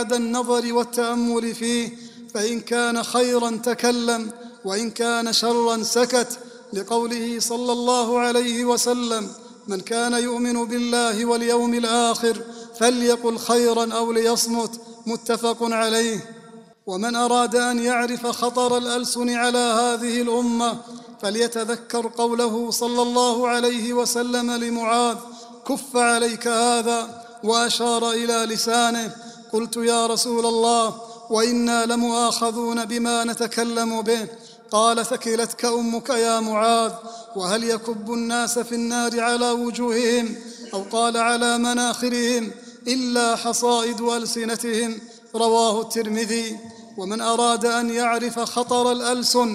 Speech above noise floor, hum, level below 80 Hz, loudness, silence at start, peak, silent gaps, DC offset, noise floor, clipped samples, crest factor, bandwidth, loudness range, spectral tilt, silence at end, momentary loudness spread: 24 dB; none; -64 dBFS; -21 LUFS; 0 s; -2 dBFS; none; under 0.1%; -45 dBFS; under 0.1%; 20 dB; 15.5 kHz; 2 LU; -2.5 dB/octave; 0 s; 10 LU